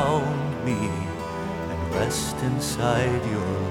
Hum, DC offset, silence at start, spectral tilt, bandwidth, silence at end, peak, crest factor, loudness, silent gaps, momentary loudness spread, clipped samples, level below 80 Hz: none; under 0.1%; 0 s; -5.5 dB/octave; 17 kHz; 0 s; -8 dBFS; 16 dB; -26 LUFS; none; 7 LU; under 0.1%; -44 dBFS